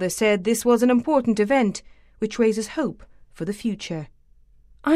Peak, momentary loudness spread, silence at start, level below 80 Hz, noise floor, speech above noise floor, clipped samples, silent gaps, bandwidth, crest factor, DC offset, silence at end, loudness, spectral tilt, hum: -6 dBFS; 14 LU; 0 s; -52 dBFS; -53 dBFS; 32 dB; under 0.1%; none; 15.5 kHz; 16 dB; under 0.1%; 0 s; -22 LUFS; -5 dB/octave; none